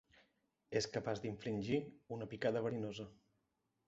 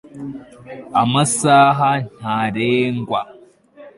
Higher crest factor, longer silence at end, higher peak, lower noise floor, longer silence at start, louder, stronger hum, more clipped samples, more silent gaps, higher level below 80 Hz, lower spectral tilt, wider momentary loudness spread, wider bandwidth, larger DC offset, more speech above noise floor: about the same, 20 dB vs 16 dB; first, 0.75 s vs 0.1 s; second, -22 dBFS vs -2 dBFS; first, -85 dBFS vs -44 dBFS; first, 0.7 s vs 0.15 s; second, -42 LUFS vs -17 LUFS; neither; neither; neither; second, -72 dBFS vs -58 dBFS; about the same, -5 dB/octave vs -4.5 dB/octave; second, 10 LU vs 23 LU; second, 7.6 kHz vs 11.5 kHz; neither; first, 44 dB vs 27 dB